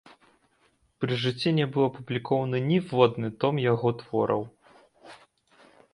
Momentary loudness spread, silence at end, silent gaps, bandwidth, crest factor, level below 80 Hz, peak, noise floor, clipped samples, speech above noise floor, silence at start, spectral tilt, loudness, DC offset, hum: 7 LU; 0.8 s; none; 11 kHz; 22 dB; -66 dBFS; -4 dBFS; -67 dBFS; under 0.1%; 42 dB; 1 s; -7.5 dB/octave; -26 LUFS; under 0.1%; none